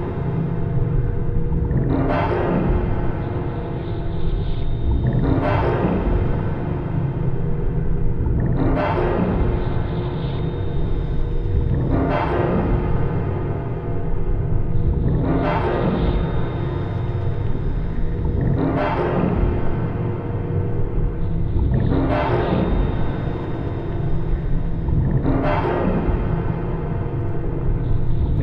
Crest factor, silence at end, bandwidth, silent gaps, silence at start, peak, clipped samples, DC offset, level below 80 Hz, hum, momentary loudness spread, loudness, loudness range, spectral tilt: 14 dB; 0 s; 5 kHz; none; 0 s; -6 dBFS; under 0.1%; under 0.1%; -24 dBFS; none; 6 LU; -22 LUFS; 1 LU; -10.5 dB/octave